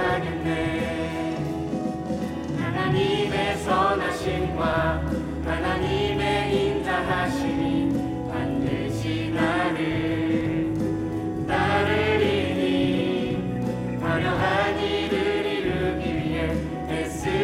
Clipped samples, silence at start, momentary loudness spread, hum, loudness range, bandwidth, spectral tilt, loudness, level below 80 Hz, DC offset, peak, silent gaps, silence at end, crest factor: under 0.1%; 0 s; 6 LU; none; 2 LU; 15.5 kHz; -6.5 dB/octave; -25 LUFS; -42 dBFS; under 0.1%; -10 dBFS; none; 0 s; 14 dB